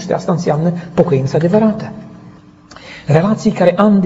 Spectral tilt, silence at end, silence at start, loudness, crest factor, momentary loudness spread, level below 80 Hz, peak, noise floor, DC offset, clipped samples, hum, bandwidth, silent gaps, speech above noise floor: -8 dB/octave; 0 s; 0 s; -14 LUFS; 14 dB; 17 LU; -48 dBFS; 0 dBFS; -40 dBFS; under 0.1%; under 0.1%; none; 8 kHz; none; 27 dB